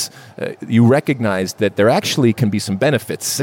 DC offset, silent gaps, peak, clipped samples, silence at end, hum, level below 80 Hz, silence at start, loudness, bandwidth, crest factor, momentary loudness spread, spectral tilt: under 0.1%; none; -2 dBFS; under 0.1%; 0 s; none; -62 dBFS; 0 s; -16 LUFS; 17 kHz; 14 dB; 12 LU; -5 dB/octave